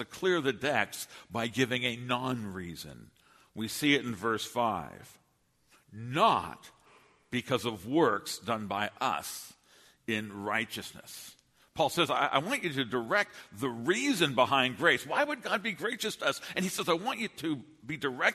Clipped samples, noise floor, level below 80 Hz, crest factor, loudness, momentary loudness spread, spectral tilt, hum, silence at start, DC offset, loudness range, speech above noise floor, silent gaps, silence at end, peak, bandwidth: under 0.1%; -71 dBFS; -68 dBFS; 22 dB; -31 LUFS; 16 LU; -4 dB/octave; none; 0 s; under 0.1%; 5 LU; 39 dB; none; 0 s; -10 dBFS; 13.5 kHz